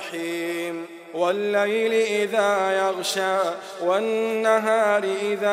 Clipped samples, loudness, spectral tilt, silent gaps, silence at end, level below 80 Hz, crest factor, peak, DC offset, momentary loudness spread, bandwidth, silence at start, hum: under 0.1%; -23 LUFS; -3.5 dB/octave; none; 0 s; -86 dBFS; 16 dB; -6 dBFS; under 0.1%; 8 LU; 16 kHz; 0 s; none